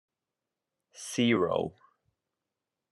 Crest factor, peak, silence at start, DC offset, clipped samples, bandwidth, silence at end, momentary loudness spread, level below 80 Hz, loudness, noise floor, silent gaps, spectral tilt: 20 dB; -14 dBFS; 0.95 s; under 0.1%; under 0.1%; 12 kHz; 1.2 s; 14 LU; -72 dBFS; -29 LUFS; -89 dBFS; none; -5 dB/octave